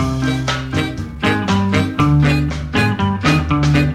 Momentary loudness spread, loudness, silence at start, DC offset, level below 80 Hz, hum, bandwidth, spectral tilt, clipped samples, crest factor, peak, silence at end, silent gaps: 6 LU; -16 LUFS; 0 s; under 0.1%; -30 dBFS; none; 13 kHz; -6 dB/octave; under 0.1%; 14 dB; -2 dBFS; 0 s; none